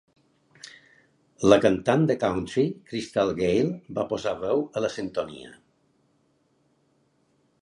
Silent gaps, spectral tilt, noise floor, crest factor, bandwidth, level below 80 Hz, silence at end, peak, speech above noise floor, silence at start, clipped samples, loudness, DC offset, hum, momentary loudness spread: none; -6 dB/octave; -67 dBFS; 24 dB; 11.5 kHz; -56 dBFS; 2.05 s; -2 dBFS; 43 dB; 0.65 s; under 0.1%; -25 LUFS; under 0.1%; none; 20 LU